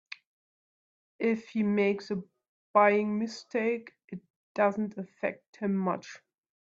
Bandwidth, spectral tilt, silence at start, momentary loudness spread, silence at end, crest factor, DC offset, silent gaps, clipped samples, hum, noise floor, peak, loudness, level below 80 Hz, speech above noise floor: 7.6 kHz; -7 dB/octave; 1.2 s; 21 LU; 0.65 s; 22 dB; under 0.1%; 2.49-2.74 s, 4.04-4.08 s, 4.30-4.55 s, 5.48-5.53 s; under 0.1%; none; under -90 dBFS; -10 dBFS; -30 LUFS; -76 dBFS; over 61 dB